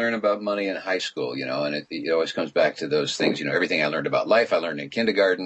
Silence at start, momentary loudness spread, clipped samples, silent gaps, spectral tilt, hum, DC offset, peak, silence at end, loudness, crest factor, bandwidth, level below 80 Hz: 0 s; 7 LU; under 0.1%; none; -4.5 dB/octave; none; under 0.1%; -6 dBFS; 0 s; -24 LUFS; 16 dB; 8.6 kHz; -74 dBFS